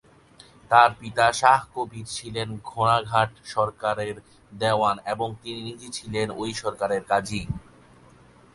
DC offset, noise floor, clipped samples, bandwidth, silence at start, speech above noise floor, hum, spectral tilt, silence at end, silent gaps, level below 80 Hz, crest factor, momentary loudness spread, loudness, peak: under 0.1%; -53 dBFS; under 0.1%; 11.5 kHz; 0.7 s; 28 dB; none; -4 dB/octave; 0.95 s; none; -52 dBFS; 24 dB; 16 LU; -24 LUFS; 0 dBFS